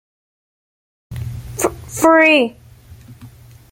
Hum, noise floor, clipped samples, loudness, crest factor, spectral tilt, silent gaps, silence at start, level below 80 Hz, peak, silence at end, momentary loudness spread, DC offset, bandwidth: none; -41 dBFS; under 0.1%; -14 LUFS; 18 dB; -4 dB/octave; none; 1.1 s; -44 dBFS; -2 dBFS; 0.45 s; 19 LU; under 0.1%; 17 kHz